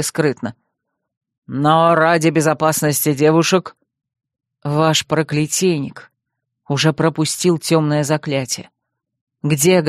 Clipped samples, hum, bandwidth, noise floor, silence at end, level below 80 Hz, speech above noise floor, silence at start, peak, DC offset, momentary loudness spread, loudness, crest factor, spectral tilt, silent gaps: under 0.1%; none; 15 kHz; -77 dBFS; 0 s; -58 dBFS; 61 dB; 0 s; 0 dBFS; under 0.1%; 11 LU; -16 LUFS; 16 dB; -4.5 dB/octave; 1.17-1.21 s, 1.38-1.42 s, 9.21-9.27 s